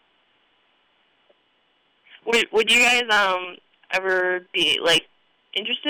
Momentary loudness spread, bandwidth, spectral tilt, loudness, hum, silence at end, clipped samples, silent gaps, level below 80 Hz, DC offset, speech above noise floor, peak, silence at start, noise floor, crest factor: 13 LU; over 20 kHz; -1 dB/octave; -19 LUFS; none; 0 s; under 0.1%; none; -62 dBFS; under 0.1%; 44 dB; -12 dBFS; 2.25 s; -65 dBFS; 12 dB